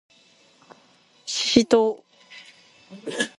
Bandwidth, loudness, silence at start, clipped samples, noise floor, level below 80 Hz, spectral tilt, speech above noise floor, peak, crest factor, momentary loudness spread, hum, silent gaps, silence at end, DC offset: 11.5 kHz; -21 LUFS; 1.25 s; under 0.1%; -58 dBFS; -58 dBFS; -3 dB/octave; 36 dB; 0 dBFS; 26 dB; 26 LU; none; none; 0.1 s; under 0.1%